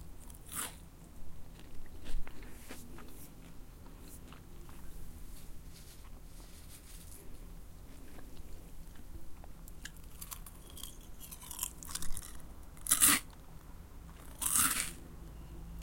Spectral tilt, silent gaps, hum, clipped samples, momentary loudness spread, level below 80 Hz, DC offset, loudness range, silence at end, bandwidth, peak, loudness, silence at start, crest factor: -1 dB/octave; none; none; under 0.1%; 24 LU; -48 dBFS; under 0.1%; 22 LU; 0 s; 17 kHz; -8 dBFS; -33 LUFS; 0 s; 32 dB